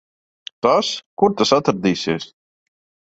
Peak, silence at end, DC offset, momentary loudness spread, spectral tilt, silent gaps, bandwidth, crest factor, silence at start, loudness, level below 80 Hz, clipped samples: -2 dBFS; 0.9 s; under 0.1%; 19 LU; -4.5 dB/octave; 1.06-1.17 s; 8.2 kHz; 18 dB; 0.65 s; -19 LUFS; -56 dBFS; under 0.1%